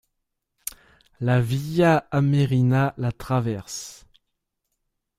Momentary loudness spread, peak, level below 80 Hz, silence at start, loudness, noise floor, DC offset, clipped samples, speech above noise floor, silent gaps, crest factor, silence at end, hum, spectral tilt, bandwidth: 17 LU; -6 dBFS; -52 dBFS; 1.2 s; -22 LUFS; -79 dBFS; under 0.1%; under 0.1%; 57 dB; none; 18 dB; 1.25 s; none; -6.5 dB/octave; 15.5 kHz